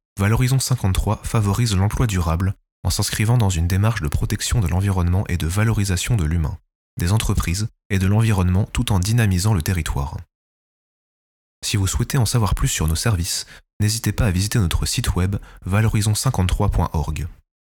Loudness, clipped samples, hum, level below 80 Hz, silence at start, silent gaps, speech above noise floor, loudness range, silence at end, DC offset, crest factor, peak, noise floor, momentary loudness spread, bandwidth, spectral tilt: -20 LUFS; under 0.1%; none; -30 dBFS; 0.15 s; 2.72-2.83 s, 6.75-6.97 s, 7.85-7.90 s, 10.35-11.62 s, 13.73-13.80 s; over 71 dB; 3 LU; 0.4 s; under 0.1%; 16 dB; -4 dBFS; under -90 dBFS; 8 LU; 18.5 kHz; -5 dB/octave